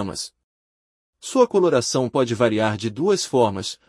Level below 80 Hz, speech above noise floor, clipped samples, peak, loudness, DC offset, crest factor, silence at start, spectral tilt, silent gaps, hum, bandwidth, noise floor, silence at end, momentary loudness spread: -64 dBFS; over 70 dB; under 0.1%; -4 dBFS; -20 LUFS; under 0.1%; 18 dB; 0 s; -4.5 dB/octave; 0.44-1.13 s; none; 12 kHz; under -90 dBFS; 0.15 s; 12 LU